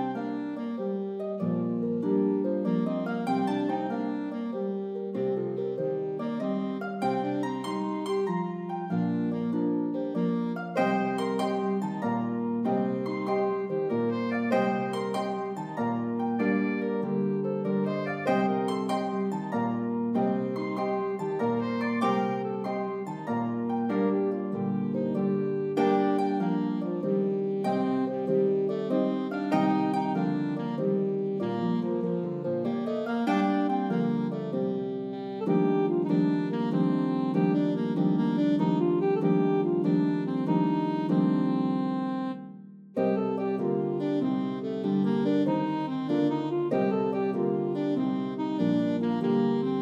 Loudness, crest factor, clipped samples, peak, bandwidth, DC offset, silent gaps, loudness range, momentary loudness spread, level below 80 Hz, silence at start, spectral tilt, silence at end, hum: -28 LUFS; 16 dB; under 0.1%; -12 dBFS; 9.4 kHz; under 0.1%; none; 4 LU; 6 LU; -78 dBFS; 0 s; -8.5 dB/octave; 0 s; none